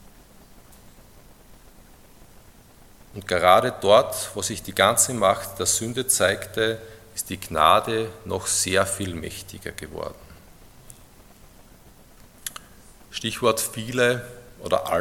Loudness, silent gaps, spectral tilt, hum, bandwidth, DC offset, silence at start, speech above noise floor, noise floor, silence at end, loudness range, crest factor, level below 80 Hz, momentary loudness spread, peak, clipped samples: -22 LUFS; none; -2.5 dB/octave; none; 17.5 kHz; under 0.1%; 1.5 s; 28 dB; -50 dBFS; 0 s; 18 LU; 24 dB; -54 dBFS; 18 LU; 0 dBFS; under 0.1%